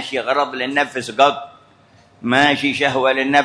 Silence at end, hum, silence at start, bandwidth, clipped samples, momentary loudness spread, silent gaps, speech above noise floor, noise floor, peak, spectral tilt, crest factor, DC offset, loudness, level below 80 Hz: 0 s; none; 0 s; 11 kHz; under 0.1%; 6 LU; none; 34 dB; -51 dBFS; 0 dBFS; -4 dB/octave; 18 dB; under 0.1%; -17 LUFS; -62 dBFS